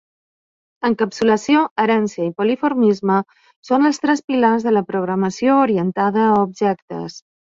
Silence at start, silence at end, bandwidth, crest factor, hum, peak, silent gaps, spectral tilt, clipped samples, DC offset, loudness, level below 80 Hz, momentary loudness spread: 0.8 s; 0.4 s; 7.8 kHz; 16 dB; none; -2 dBFS; 1.71-1.76 s, 3.56-3.63 s, 4.24-4.28 s, 6.82-6.88 s; -6 dB/octave; under 0.1%; under 0.1%; -18 LUFS; -62 dBFS; 7 LU